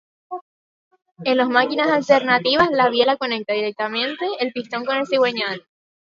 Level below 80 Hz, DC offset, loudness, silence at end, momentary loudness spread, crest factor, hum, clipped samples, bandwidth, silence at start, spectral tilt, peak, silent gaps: -62 dBFS; under 0.1%; -19 LUFS; 0.5 s; 11 LU; 20 dB; none; under 0.1%; 7.4 kHz; 0.3 s; -4.5 dB/octave; -2 dBFS; 0.41-0.91 s